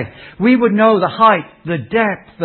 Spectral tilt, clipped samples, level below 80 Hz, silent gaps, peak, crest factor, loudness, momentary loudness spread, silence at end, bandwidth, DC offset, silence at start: -9.5 dB/octave; under 0.1%; -52 dBFS; none; 0 dBFS; 14 dB; -14 LUFS; 12 LU; 0 s; 4.4 kHz; under 0.1%; 0 s